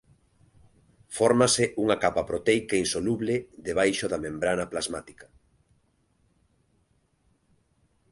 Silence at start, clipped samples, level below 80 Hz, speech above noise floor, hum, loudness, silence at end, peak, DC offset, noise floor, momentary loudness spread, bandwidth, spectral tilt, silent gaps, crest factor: 1.1 s; under 0.1%; -56 dBFS; 43 dB; none; -26 LUFS; 2.9 s; -6 dBFS; under 0.1%; -69 dBFS; 10 LU; 11.5 kHz; -4 dB/octave; none; 22 dB